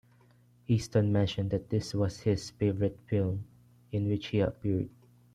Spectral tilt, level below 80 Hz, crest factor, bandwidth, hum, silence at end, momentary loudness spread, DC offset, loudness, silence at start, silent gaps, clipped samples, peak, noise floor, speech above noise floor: -7.5 dB/octave; -56 dBFS; 18 dB; 11 kHz; none; 0.45 s; 8 LU; under 0.1%; -31 LUFS; 0.7 s; none; under 0.1%; -14 dBFS; -62 dBFS; 32 dB